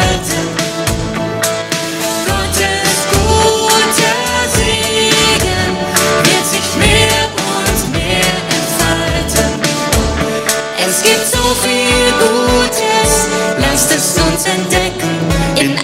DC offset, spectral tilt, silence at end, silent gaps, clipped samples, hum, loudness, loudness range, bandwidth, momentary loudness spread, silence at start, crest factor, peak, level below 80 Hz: under 0.1%; -3 dB/octave; 0 s; none; under 0.1%; none; -12 LUFS; 3 LU; 19 kHz; 6 LU; 0 s; 12 dB; 0 dBFS; -26 dBFS